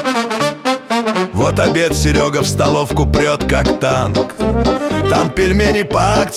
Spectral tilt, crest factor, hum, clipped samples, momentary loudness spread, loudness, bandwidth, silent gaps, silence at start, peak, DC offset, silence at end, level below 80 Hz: -5 dB/octave; 12 dB; none; under 0.1%; 4 LU; -15 LUFS; 15.5 kHz; none; 0 s; -2 dBFS; under 0.1%; 0 s; -26 dBFS